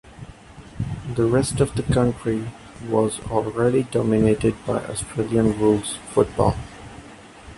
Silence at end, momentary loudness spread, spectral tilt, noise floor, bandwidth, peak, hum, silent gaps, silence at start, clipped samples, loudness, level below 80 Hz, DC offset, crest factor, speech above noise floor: 0 s; 19 LU; -6.5 dB/octave; -43 dBFS; 11.5 kHz; -2 dBFS; none; none; 0.05 s; under 0.1%; -22 LUFS; -40 dBFS; under 0.1%; 20 dB; 22 dB